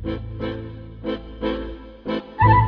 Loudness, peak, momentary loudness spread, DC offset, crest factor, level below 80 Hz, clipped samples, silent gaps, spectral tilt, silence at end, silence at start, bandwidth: -26 LUFS; -4 dBFS; 14 LU; under 0.1%; 20 dB; -34 dBFS; under 0.1%; none; -9.5 dB/octave; 0 s; 0 s; 5.2 kHz